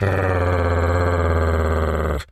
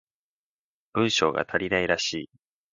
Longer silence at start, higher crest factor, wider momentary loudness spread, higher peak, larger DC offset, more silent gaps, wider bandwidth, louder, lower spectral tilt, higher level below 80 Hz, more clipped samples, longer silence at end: second, 0 s vs 0.95 s; second, 14 dB vs 22 dB; second, 2 LU vs 11 LU; first, -4 dBFS vs -8 dBFS; neither; neither; first, 12.5 kHz vs 9.6 kHz; first, -20 LUFS vs -25 LUFS; first, -7.5 dB/octave vs -3.5 dB/octave; first, -30 dBFS vs -58 dBFS; neither; second, 0.1 s vs 0.45 s